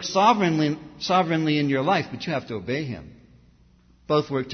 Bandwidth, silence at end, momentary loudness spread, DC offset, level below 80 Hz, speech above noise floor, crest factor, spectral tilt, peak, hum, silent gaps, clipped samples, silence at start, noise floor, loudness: 6.6 kHz; 0 s; 10 LU; under 0.1%; -58 dBFS; 34 dB; 20 dB; -5.5 dB/octave; -4 dBFS; none; none; under 0.1%; 0 s; -56 dBFS; -23 LUFS